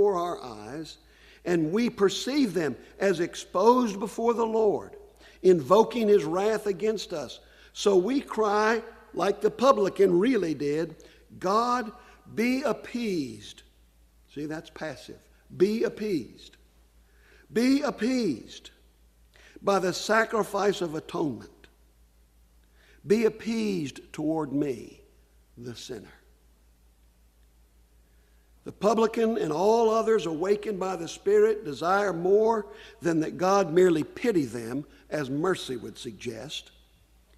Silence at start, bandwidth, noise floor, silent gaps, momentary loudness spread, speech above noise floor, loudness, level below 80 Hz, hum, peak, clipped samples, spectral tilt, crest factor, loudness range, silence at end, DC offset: 0 s; 14.5 kHz; -60 dBFS; none; 16 LU; 34 dB; -26 LUFS; -60 dBFS; none; -6 dBFS; under 0.1%; -5.5 dB/octave; 22 dB; 8 LU; 0.75 s; under 0.1%